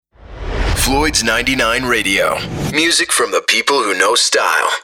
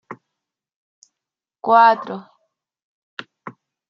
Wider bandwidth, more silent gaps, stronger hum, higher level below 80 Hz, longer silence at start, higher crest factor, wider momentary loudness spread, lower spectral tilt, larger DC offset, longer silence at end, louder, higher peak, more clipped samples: first, 17.5 kHz vs 7.2 kHz; second, none vs 0.76-1.02 s, 2.82-3.17 s; neither; first, -28 dBFS vs -80 dBFS; first, 0.3 s vs 0.1 s; second, 14 dB vs 22 dB; second, 7 LU vs 27 LU; second, -2 dB/octave vs -5.5 dB/octave; neither; second, 0 s vs 0.4 s; about the same, -13 LUFS vs -15 LUFS; about the same, -2 dBFS vs -2 dBFS; neither